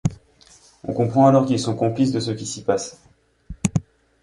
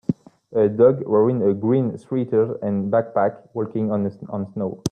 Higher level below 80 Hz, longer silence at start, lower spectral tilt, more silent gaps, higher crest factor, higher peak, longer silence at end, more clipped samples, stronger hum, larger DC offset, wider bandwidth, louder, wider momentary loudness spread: first, -48 dBFS vs -60 dBFS; about the same, 0.05 s vs 0.1 s; second, -6.5 dB/octave vs -8.5 dB/octave; neither; about the same, 20 dB vs 16 dB; about the same, -2 dBFS vs -4 dBFS; first, 0.4 s vs 0 s; neither; neither; neither; first, 11.5 kHz vs 9.8 kHz; about the same, -21 LUFS vs -21 LUFS; about the same, 13 LU vs 11 LU